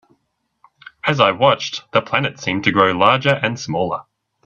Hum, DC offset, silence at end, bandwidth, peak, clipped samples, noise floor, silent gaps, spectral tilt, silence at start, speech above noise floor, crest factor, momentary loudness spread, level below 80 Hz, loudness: none; under 0.1%; 0.45 s; 8 kHz; 0 dBFS; under 0.1%; -69 dBFS; none; -5 dB/octave; 1.05 s; 52 dB; 18 dB; 8 LU; -56 dBFS; -17 LUFS